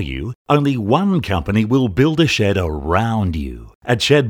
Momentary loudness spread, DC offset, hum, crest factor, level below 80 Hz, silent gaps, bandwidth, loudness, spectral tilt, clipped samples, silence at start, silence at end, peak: 11 LU; under 0.1%; none; 16 dB; -34 dBFS; 0.35-0.45 s, 3.75-3.81 s; 18 kHz; -17 LUFS; -6 dB/octave; under 0.1%; 0 s; 0 s; 0 dBFS